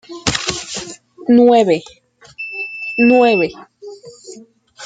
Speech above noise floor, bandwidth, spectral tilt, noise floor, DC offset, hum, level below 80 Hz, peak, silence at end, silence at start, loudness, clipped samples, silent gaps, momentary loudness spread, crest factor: 29 dB; 9.4 kHz; -4 dB/octave; -41 dBFS; under 0.1%; none; -50 dBFS; 0 dBFS; 0 s; 0.1 s; -15 LUFS; under 0.1%; none; 25 LU; 16 dB